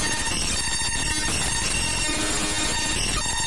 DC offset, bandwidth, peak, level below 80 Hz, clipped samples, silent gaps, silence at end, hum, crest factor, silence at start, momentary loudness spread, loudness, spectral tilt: 2%; 11.5 kHz; -12 dBFS; -34 dBFS; under 0.1%; none; 0 s; none; 12 dB; 0 s; 1 LU; -23 LUFS; -1.5 dB/octave